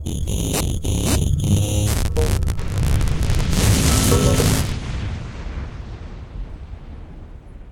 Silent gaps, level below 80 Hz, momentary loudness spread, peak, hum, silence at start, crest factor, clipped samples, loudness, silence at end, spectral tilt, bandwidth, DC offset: none; -24 dBFS; 21 LU; -2 dBFS; none; 0 s; 18 dB; under 0.1%; -20 LUFS; 0 s; -5 dB/octave; 17 kHz; under 0.1%